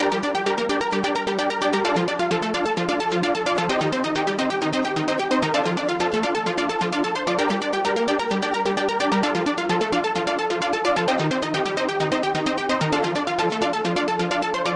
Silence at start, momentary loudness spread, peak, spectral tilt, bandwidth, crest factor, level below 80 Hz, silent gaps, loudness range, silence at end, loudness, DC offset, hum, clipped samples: 0 s; 2 LU; -10 dBFS; -4.5 dB/octave; 11.5 kHz; 12 dB; -56 dBFS; none; 0 LU; 0 s; -22 LUFS; under 0.1%; none; under 0.1%